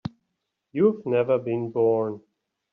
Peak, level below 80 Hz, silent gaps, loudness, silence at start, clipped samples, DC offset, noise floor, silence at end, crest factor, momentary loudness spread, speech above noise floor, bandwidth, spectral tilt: -8 dBFS; -66 dBFS; none; -24 LUFS; 0.05 s; under 0.1%; under 0.1%; -80 dBFS; 0.55 s; 18 dB; 13 LU; 57 dB; 5.4 kHz; -8 dB/octave